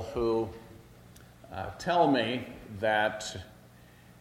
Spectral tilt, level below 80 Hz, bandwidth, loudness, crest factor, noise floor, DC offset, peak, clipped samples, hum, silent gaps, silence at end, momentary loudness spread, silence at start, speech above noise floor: -5 dB/octave; -56 dBFS; 16.5 kHz; -30 LUFS; 20 dB; -55 dBFS; under 0.1%; -12 dBFS; under 0.1%; 60 Hz at -60 dBFS; none; 0.45 s; 19 LU; 0 s; 25 dB